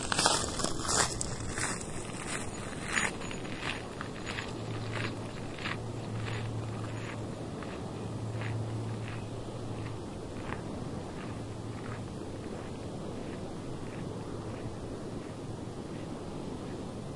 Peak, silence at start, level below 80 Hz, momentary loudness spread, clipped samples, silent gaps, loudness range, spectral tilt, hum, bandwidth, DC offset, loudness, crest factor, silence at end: -6 dBFS; 0 s; -50 dBFS; 10 LU; under 0.1%; none; 7 LU; -3.5 dB/octave; none; 11.5 kHz; under 0.1%; -36 LUFS; 30 dB; 0 s